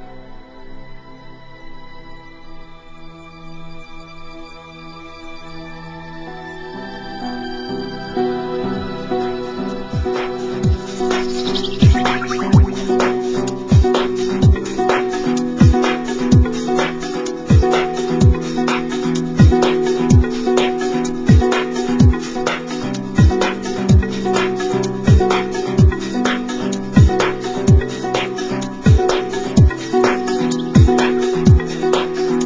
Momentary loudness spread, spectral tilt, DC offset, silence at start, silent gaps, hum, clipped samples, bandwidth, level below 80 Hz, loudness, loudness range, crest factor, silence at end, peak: 18 LU; -6.5 dB/octave; under 0.1%; 0 s; none; none; under 0.1%; 7.8 kHz; -24 dBFS; -16 LUFS; 15 LU; 16 dB; 0 s; 0 dBFS